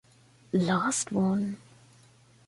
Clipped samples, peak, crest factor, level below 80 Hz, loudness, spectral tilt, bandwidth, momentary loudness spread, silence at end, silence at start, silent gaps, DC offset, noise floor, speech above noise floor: under 0.1%; -14 dBFS; 16 dB; -66 dBFS; -28 LUFS; -5 dB/octave; 11.5 kHz; 8 LU; 0.9 s; 0.55 s; none; under 0.1%; -59 dBFS; 32 dB